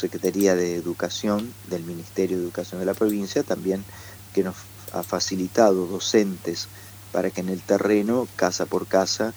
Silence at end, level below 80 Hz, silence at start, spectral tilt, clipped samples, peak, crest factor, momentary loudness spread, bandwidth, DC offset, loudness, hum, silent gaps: 0 s; -60 dBFS; 0 s; -4.5 dB/octave; under 0.1%; -4 dBFS; 20 dB; 11 LU; over 20 kHz; under 0.1%; -24 LUFS; none; none